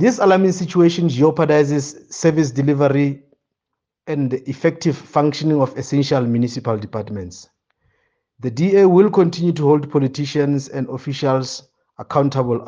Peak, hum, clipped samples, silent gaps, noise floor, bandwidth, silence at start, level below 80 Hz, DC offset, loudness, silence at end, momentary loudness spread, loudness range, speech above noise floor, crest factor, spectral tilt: -2 dBFS; none; under 0.1%; none; -81 dBFS; 9.8 kHz; 0 s; -60 dBFS; under 0.1%; -17 LUFS; 0 s; 13 LU; 4 LU; 64 dB; 16 dB; -7 dB/octave